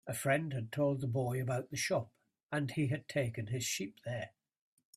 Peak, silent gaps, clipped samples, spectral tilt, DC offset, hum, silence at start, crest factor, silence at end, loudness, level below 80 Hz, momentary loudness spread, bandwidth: -18 dBFS; 2.43-2.47 s; under 0.1%; -5 dB/octave; under 0.1%; none; 0.05 s; 18 dB; 0.65 s; -36 LUFS; -70 dBFS; 9 LU; 15.5 kHz